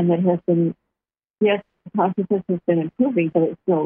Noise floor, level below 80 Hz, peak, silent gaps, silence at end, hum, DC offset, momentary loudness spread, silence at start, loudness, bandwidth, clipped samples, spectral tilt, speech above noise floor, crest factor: -87 dBFS; -66 dBFS; -6 dBFS; 1.30-1.34 s; 0 s; none; under 0.1%; 6 LU; 0 s; -21 LUFS; 3.5 kHz; under 0.1%; -12 dB/octave; 67 dB; 14 dB